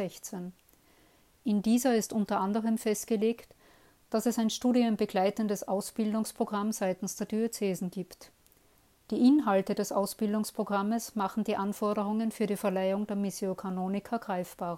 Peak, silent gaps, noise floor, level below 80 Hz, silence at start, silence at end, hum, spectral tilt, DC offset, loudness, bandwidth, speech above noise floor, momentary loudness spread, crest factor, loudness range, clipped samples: -14 dBFS; none; -65 dBFS; -68 dBFS; 0 s; 0 s; none; -5.5 dB/octave; under 0.1%; -30 LUFS; 16 kHz; 35 dB; 9 LU; 16 dB; 3 LU; under 0.1%